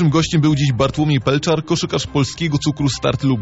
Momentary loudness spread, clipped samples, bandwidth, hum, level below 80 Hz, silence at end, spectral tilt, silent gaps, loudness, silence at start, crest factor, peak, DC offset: 4 LU; under 0.1%; 8 kHz; none; -40 dBFS; 0 s; -6 dB/octave; none; -17 LUFS; 0 s; 14 dB; -2 dBFS; under 0.1%